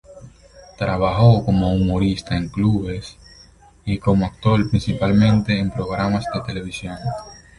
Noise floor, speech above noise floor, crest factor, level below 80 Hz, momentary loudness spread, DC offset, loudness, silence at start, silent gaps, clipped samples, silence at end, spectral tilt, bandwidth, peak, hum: -48 dBFS; 30 dB; 18 dB; -36 dBFS; 13 LU; under 0.1%; -20 LUFS; 0.1 s; none; under 0.1%; 0.2 s; -7.5 dB/octave; 11 kHz; -2 dBFS; none